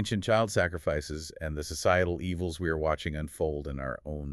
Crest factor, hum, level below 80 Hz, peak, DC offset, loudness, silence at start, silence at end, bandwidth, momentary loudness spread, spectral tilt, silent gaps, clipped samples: 20 dB; none; -44 dBFS; -12 dBFS; under 0.1%; -30 LUFS; 0 s; 0 s; 13.5 kHz; 10 LU; -5 dB/octave; none; under 0.1%